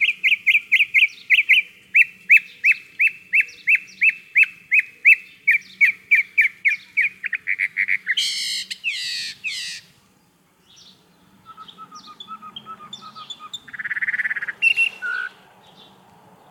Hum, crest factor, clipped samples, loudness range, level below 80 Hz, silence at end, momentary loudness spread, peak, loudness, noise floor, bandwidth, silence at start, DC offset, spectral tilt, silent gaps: none; 20 dB; under 0.1%; 16 LU; -76 dBFS; 1.2 s; 21 LU; -2 dBFS; -17 LUFS; -59 dBFS; 17 kHz; 0 s; under 0.1%; 2 dB/octave; none